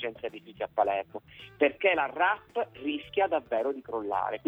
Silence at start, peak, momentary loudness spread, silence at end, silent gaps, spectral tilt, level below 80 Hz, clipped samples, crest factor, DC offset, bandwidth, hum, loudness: 0 s; -12 dBFS; 14 LU; 0.1 s; none; -6 dB/octave; -66 dBFS; under 0.1%; 18 dB; under 0.1%; 5 kHz; none; -29 LUFS